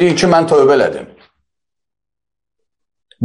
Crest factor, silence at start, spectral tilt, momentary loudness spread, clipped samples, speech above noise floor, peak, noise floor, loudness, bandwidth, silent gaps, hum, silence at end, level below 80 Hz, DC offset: 14 dB; 0 s; -5.5 dB/octave; 9 LU; under 0.1%; 73 dB; 0 dBFS; -84 dBFS; -11 LUFS; 10.5 kHz; none; none; 0 s; -52 dBFS; under 0.1%